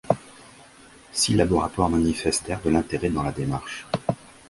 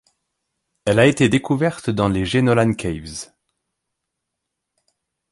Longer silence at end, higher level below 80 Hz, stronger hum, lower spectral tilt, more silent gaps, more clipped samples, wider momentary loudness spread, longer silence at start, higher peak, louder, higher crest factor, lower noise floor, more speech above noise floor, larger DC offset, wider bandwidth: second, 0.35 s vs 2.1 s; about the same, -42 dBFS vs -46 dBFS; neither; about the same, -5 dB/octave vs -6 dB/octave; neither; neither; second, 9 LU vs 16 LU; second, 0.05 s vs 0.85 s; about the same, -4 dBFS vs -2 dBFS; second, -24 LUFS vs -18 LUFS; about the same, 22 dB vs 18 dB; second, -50 dBFS vs -80 dBFS; second, 26 dB vs 62 dB; neither; about the same, 11.5 kHz vs 11.5 kHz